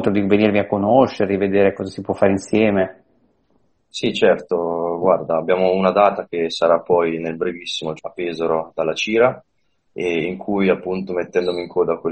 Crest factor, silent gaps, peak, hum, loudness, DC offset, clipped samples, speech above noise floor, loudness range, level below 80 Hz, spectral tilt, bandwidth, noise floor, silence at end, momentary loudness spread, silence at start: 18 dB; none; 0 dBFS; none; -19 LUFS; under 0.1%; under 0.1%; 45 dB; 3 LU; -56 dBFS; -6 dB/octave; 8.8 kHz; -63 dBFS; 0 s; 9 LU; 0 s